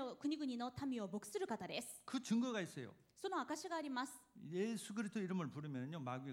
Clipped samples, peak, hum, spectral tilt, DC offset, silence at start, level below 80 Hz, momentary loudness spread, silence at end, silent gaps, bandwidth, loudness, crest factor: under 0.1%; -28 dBFS; none; -5 dB/octave; under 0.1%; 0 s; -80 dBFS; 8 LU; 0 s; none; 16.5 kHz; -45 LUFS; 16 dB